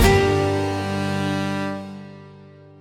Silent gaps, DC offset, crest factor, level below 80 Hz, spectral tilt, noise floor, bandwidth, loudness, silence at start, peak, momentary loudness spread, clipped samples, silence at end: none; under 0.1%; 20 dB; -32 dBFS; -5.5 dB/octave; -45 dBFS; 16 kHz; -22 LUFS; 0 s; -2 dBFS; 21 LU; under 0.1%; 0.3 s